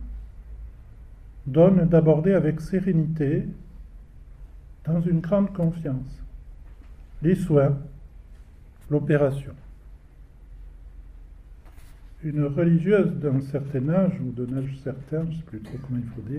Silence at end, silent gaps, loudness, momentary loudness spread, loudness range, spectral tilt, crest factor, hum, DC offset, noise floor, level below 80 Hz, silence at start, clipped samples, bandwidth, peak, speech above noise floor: 0 s; none; -23 LUFS; 22 LU; 8 LU; -10 dB/octave; 20 dB; none; under 0.1%; -47 dBFS; -44 dBFS; 0 s; under 0.1%; 9.4 kHz; -4 dBFS; 25 dB